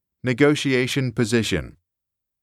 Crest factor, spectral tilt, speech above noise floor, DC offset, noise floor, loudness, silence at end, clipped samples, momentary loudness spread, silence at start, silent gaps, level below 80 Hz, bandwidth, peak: 18 dB; -5 dB/octave; 63 dB; under 0.1%; -83 dBFS; -21 LUFS; 0.7 s; under 0.1%; 8 LU; 0.25 s; none; -48 dBFS; 14.5 kHz; -4 dBFS